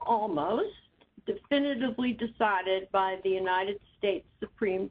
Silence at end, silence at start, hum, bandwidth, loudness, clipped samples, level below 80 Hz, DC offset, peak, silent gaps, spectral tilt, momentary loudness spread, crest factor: 0 s; 0 s; none; 5 kHz; -30 LUFS; under 0.1%; -64 dBFS; under 0.1%; -12 dBFS; none; -8 dB/octave; 8 LU; 18 dB